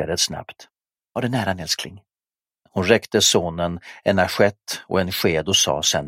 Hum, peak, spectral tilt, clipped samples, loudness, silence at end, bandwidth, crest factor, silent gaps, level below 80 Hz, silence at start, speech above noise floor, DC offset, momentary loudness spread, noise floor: none; 0 dBFS; -3 dB/octave; under 0.1%; -20 LUFS; 0 s; 16 kHz; 22 dB; none; -50 dBFS; 0 s; over 69 dB; under 0.1%; 12 LU; under -90 dBFS